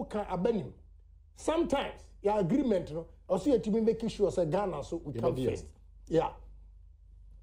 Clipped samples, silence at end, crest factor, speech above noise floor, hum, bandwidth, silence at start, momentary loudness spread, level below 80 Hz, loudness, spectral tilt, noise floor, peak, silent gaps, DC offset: under 0.1%; 0 s; 16 dB; 25 dB; none; 15.5 kHz; 0 s; 10 LU; -52 dBFS; -32 LUFS; -7 dB/octave; -56 dBFS; -16 dBFS; none; under 0.1%